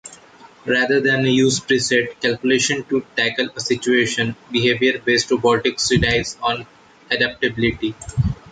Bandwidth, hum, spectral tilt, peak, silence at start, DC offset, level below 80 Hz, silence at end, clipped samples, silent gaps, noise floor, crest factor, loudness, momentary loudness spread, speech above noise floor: 9.4 kHz; none; -4 dB/octave; -4 dBFS; 0.05 s; under 0.1%; -40 dBFS; 0 s; under 0.1%; none; -46 dBFS; 16 dB; -18 LUFS; 7 LU; 27 dB